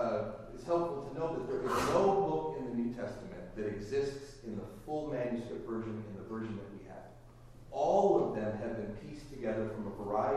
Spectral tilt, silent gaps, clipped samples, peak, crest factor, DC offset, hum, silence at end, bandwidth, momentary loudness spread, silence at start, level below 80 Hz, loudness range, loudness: -6.5 dB/octave; none; under 0.1%; -16 dBFS; 18 dB; under 0.1%; none; 0 s; 14 kHz; 17 LU; 0 s; -56 dBFS; 7 LU; -36 LUFS